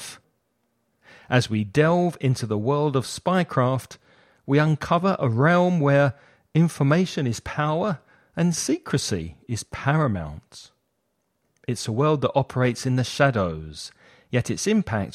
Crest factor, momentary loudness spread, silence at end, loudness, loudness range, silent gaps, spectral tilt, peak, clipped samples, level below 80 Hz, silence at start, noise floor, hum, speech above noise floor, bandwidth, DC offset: 20 dB; 13 LU; 0.05 s; -23 LUFS; 5 LU; none; -6 dB/octave; -4 dBFS; under 0.1%; -52 dBFS; 0 s; -74 dBFS; none; 51 dB; 14 kHz; under 0.1%